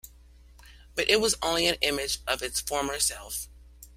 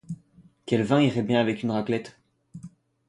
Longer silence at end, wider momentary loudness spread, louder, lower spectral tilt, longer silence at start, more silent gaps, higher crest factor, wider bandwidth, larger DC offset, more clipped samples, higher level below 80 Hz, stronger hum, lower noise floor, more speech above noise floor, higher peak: second, 0.05 s vs 0.4 s; second, 13 LU vs 23 LU; about the same, -27 LUFS vs -25 LUFS; second, -1 dB/octave vs -7 dB/octave; about the same, 0.05 s vs 0.1 s; neither; first, 24 dB vs 18 dB; first, 16 kHz vs 11 kHz; neither; neither; first, -48 dBFS vs -62 dBFS; neither; second, -53 dBFS vs -57 dBFS; second, 25 dB vs 33 dB; about the same, -6 dBFS vs -8 dBFS